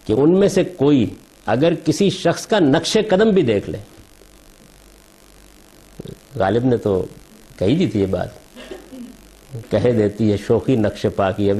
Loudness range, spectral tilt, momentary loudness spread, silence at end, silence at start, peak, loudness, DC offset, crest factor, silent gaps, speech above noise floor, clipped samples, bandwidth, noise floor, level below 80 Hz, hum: 7 LU; -6.5 dB/octave; 21 LU; 0 s; 0.05 s; -4 dBFS; -18 LUFS; under 0.1%; 14 dB; none; 30 dB; under 0.1%; 13.5 kHz; -47 dBFS; -46 dBFS; none